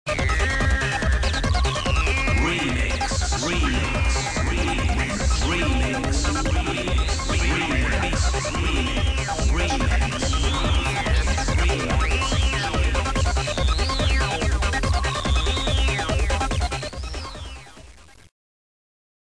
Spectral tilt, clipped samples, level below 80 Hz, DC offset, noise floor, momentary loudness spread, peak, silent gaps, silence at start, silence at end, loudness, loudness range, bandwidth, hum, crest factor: -4 dB/octave; under 0.1%; -24 dBFS; 0.3%; -47 dBFS; 2 LU; -10 dBFS; none; 0.05 s; 1.35 s; -22 LUFS; 2 LU; 10.5 kHz; none; 12 dB